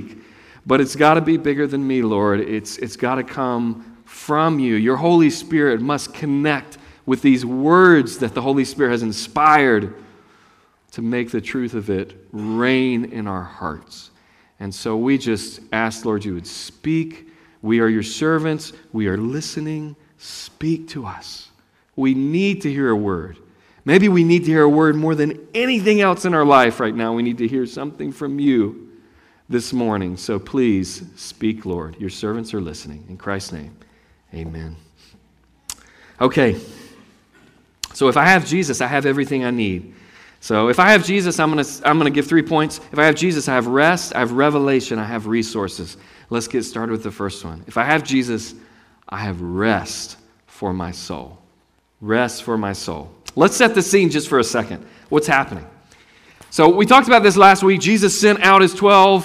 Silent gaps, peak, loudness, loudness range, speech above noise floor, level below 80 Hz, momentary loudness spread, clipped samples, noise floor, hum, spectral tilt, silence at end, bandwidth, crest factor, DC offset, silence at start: none; 0 dBFS; -17 LUFS; 9 LU; 43 dB; -52 dBFS; 19 LU; under 0.1%; -60 dBFS; none; -5 dB/octave; 0 s; 15.5 kHz; 18 dB; under 0.1%; 0 s